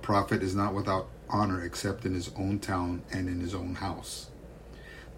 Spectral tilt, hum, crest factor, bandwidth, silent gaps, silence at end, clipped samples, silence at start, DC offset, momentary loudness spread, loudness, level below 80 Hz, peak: -6 dB/octave; none; 18 dB; 16 kHz; none; 0 s; under 0.1%; 0 s; under 0.1%; 18 LU; -32 LUFS; -50 dBFS; -12 dBFS